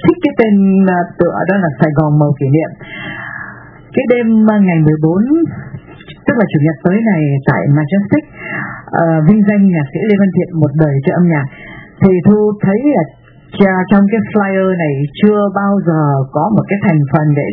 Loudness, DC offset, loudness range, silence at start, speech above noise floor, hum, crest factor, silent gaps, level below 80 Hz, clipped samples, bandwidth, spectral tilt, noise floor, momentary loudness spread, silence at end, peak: -12 LUFS; under 0.1%; 2 LU; 0 s; 23 dB; none; 12 dB; none; -44 dBFS; 0.2%; 3.9 kHz; -12 dB/octave; -34 dBFS; 13 LU; 0 s; 0 dBFS